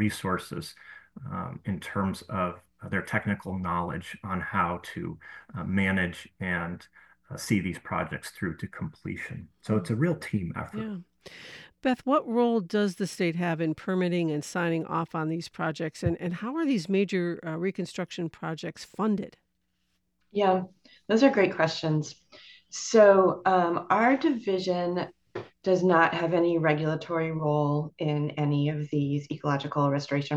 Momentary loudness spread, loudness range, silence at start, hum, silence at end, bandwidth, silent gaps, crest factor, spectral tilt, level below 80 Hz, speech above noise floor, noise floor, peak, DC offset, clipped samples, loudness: 15 LU; 8 LU; 0 s; none; 0 s; 12.5 kHz; none; 20 dB; -6.5 dB/octave; -64 dBFS; 49 dB; -77 dBFS; -8 dBFS; under 0.1%; under 0.1%; -28 LUFS